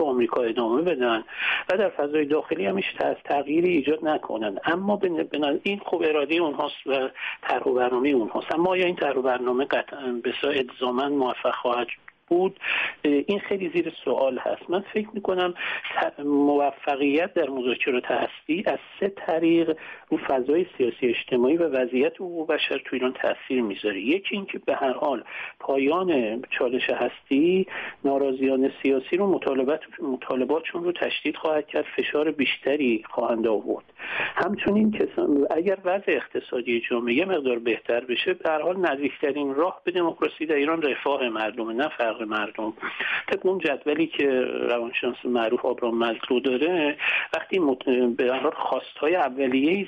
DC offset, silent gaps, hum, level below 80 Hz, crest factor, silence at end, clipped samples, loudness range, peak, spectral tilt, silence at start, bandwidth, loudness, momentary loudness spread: under 0.1%; none; none; -66 dBFS; 14 dB; 0 s; under 0.1%; 2 LU; -10 dBFS; -7 dB/octave; 0 s; 5.8 kHz; -25 LUFS; 6 LU